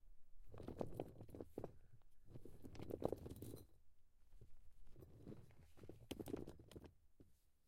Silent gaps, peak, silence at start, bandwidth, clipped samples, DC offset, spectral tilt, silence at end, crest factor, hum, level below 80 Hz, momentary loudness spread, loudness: none; -24 dBFS; 0 s; 16 kHz; under 0.1%; under 0.1%; -7 dB/octave; 0 s; 30 dB; none; -66 dBFS; 17 LU; -55 LUFS